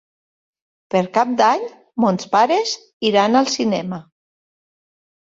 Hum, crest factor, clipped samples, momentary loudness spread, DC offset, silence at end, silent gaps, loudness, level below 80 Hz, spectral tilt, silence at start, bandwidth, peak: none; 18 dB; under 0.1%; 9 LU; under 0.1%; 1.2 s; 2.93-3.00 s; -18 LUFS; -64 dBFS; -4.5 dB/octave; 0.95 s; 7.8 kHz; -2 dBFS